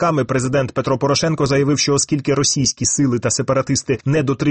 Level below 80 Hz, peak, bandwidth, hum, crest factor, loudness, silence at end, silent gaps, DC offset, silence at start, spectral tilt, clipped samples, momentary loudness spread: -46 dBFS; -4 dBFS; 8.8 kHz; none; 12 dB; -17 LUFS; 0 s; none; under 0.1%; 0 s; -4.5 dB/octave; under 0.1%; 3 LU